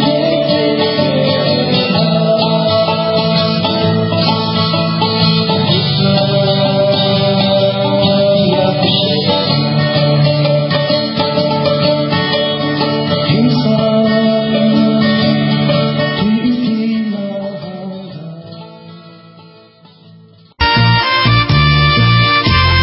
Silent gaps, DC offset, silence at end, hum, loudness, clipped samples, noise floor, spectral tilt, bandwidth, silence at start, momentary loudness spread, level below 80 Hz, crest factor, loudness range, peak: none; under 0.1%; 0 s; none; -12 LUFS; under 0.1%; -42 dBFS; -10.5 dB/octave; 5.8 kHz; 0 s; 5 LU; -32 dBFS; 12 dB; 6 LU; 0 dBFS